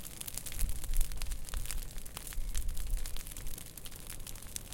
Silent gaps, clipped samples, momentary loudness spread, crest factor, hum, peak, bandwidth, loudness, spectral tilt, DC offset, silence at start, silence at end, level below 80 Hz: none; under 0.1%; 6 LU; 22 dB; none; -12 dBFS; 17 kHz; -42 LUFS; -2.5 dB/octave; under 0.1%; 0 s; 0 s; -38 dBFS